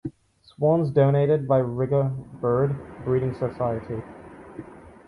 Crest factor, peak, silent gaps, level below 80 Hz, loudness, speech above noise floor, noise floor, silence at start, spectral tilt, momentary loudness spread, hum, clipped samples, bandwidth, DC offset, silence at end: 16 dB; -8 dBFS; none; -52 dBFS; -24 LUFS; 32 dB; -54 dBFS; 0.05 s; -10.5 dB/octave; 22 LU; none; under 0.1%; 4.8 kHz; under 0.1%; 0.15 s